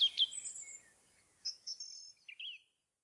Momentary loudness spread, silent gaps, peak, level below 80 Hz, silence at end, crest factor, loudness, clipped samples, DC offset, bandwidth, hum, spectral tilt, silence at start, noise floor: 18 LU; none; -22 dBFS; under -90 dBFS; 0.45 s; 20 dB; -39 LUFS; under 0.1%; under 0.1%; 11.5 kHz; none; 4.5 dB/octave; 0 s; -71 dBFS